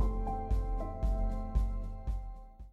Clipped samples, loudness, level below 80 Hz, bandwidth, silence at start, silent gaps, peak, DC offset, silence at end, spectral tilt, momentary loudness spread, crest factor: under 0.1%; -37 LUFS; -34 dBFS; 4.3 kHz; 0 s; none; -18 dBFS; under 0.1%; 0 s; -9 dB/octave; 8 LU; 14 dB